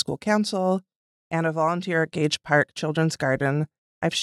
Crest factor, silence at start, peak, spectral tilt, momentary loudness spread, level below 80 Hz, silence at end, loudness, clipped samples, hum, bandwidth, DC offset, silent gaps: 18 dB; 0.1 s; -6 dBFS; -5 dB/octave; 7 LU; -64 dBFS; 0 s; -24 LUFS; under 0.1%; none; 12.5 kHz; under 0.1%; 0.96-1.30 s, 3.78-4.01 s